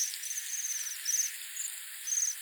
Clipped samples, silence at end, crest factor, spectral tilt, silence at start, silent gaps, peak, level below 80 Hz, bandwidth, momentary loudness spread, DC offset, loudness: under 0.1%; 0 s; 18 dB; 10 dB/octave; 0 s; none; -18 dBFS; under -90 dBFS; over 20 kHz; 7 LU; under 0.1%; -32 LUFS